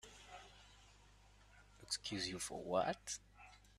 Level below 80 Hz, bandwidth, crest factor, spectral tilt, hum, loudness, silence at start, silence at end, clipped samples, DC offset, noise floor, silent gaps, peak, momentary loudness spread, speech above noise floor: -68 dBFS; 13.5 kHz; 24 dB; -2.5 dB/octave; 50 Hz at -65 dBFS; -43 LUFS; 0.05 s; 0.1 s; under 0.1%; under 0.1%; -66 dBFS; none; -24 dBFS; 23 LU; 23 dB